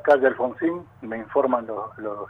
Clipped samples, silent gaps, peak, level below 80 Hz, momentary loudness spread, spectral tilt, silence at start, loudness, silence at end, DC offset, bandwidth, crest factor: under 0.1%; none; -6 dBFS; -64 dBFS; 15 LU; -7.5 dB/octave; 0.05 s; -24 LUFS; 0 s; under 0.1%; 6.4 kHz; 16 dB